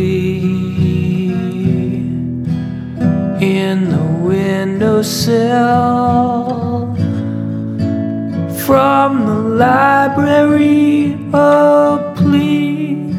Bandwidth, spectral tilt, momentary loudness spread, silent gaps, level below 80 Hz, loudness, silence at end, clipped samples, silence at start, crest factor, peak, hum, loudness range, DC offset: 16 kHz; -7 dB/octave; 9 LU; none; -44 dBFS; -13 LUFS; 0 s; under 0.1%; 0 s; 12 dB; 0 dBFS; none; 5 LU; under 0.1%